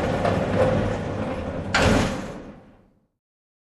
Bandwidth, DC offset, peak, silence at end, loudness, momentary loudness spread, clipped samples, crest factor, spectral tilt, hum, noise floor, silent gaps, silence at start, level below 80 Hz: 12.5 kHz; under 0.1%; -6 dBFS; 1.15 s; -23 LUFS; 15 LU; under 0.1%; 18 dB; -5.5 dB/octave; none; -56 dBFS; none; 0 s; -38 dBFS